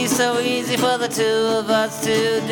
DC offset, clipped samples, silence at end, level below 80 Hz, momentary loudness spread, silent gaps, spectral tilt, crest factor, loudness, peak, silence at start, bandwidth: under 0.1%; under 0.1%; 0 s; -58 dBFS; 2 LU; none; -3 dB/octave; 14 dB; -19 LUFS; -6 dBFS; 0 s; 19.5 kHz